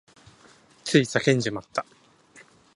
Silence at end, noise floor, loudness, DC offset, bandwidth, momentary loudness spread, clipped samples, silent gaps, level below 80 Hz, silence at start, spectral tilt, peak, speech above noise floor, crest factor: 0.95 s; -55 dBFS; -24 LUFS; under 0.1%; 11.5 kHz; 14 LU; under 0.1%; none; -66 dBFS; 0.85 s; -5 dB/octave; -4 dBFS; 32 dB; 24 dB